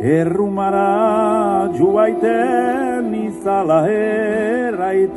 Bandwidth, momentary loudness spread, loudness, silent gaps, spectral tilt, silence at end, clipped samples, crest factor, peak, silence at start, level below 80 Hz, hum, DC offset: 11.5 kHz; 4 LU; -16 LUFS; none; -7.5 dB/octave; 0 s; under 0.1%; 12 dB; -4 dBFS; 0 s; -52 dBFS; none; under 0.1%